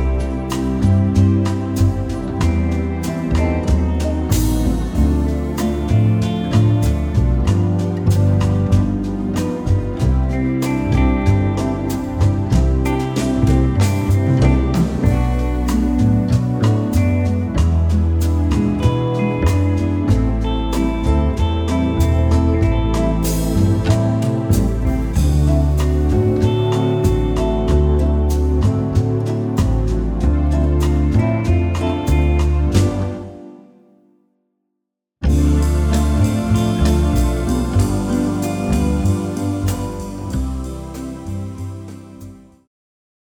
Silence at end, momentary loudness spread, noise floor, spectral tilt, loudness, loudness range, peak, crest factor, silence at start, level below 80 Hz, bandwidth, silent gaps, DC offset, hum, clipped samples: 0.95 s; 6 LU; -78 dBFS; -7.5 dB/octave; -17 LUFS; 4 LU; -2 dBFS; 14 dB; 0 s; -22 dBFS; 19.5 kHz; none; under 0.1%; none; under 0.1%